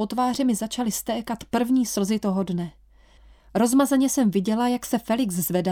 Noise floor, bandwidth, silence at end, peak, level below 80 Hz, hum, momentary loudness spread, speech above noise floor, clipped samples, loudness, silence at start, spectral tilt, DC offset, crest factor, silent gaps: -53 dBFS; 19.5 kHz; 0 s; -8 dBFS; -54 dBFS; none; 8 LU; 30 dB; under 0.1%; -23 LUFS; 0 s; -5 dB/octave; under 0.1%; 14 dB; none